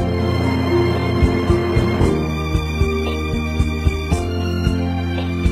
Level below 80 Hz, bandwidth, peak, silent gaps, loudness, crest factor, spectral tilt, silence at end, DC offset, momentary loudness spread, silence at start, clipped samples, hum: -24 dBFS; 14.5 kHz; -2 dBFS; none; -19 LUFS; 16 dB; -7 dB/octave; 0 s; under 0.1%; 4 LU; 0 s; under 0.1%; none